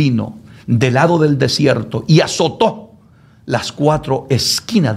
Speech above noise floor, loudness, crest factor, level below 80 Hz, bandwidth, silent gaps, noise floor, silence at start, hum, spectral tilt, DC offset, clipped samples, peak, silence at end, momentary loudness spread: 32 dB; -15 LUFS; 14 dB; -46 dBFS; 15.5 kHz; none; -46 dBFS; 0 s; none; -5.5 dB/octave; under 0.1%; under 0.1%; 0 dBFS; 0 s; 8 LU